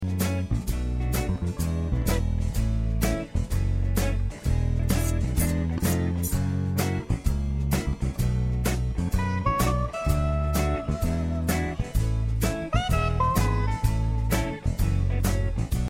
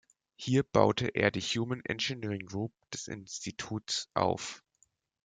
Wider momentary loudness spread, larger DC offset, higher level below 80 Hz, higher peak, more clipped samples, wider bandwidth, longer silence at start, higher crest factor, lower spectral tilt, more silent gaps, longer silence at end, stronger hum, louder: second, 4 LU vs 13 LU; neither; first, -28 dBFS vs -64 dBFS; about the same, -10 dBFS vs -8 dBFS; neither; first, 16.5 kHz vs 9.6 kHz; second, 0 s vs 0.4 s; second, 16 dB vs 26 dB; first, -6 dB/octave vs -4.5 dB/octave; neither; second, 0 s vs 0.65 s; neither; first, -27 LUFS vs -32 LUFS